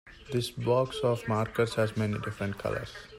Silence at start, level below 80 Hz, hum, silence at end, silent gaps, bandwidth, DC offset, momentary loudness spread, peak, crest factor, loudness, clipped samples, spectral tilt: 0.05 s; -56 dBFS; none; 0 s; none; 16 kHz; under 0.1%; 7 LU; -14 dBFS; 16 dB; -30 LUFS; under 0.1%; -6 dB/octave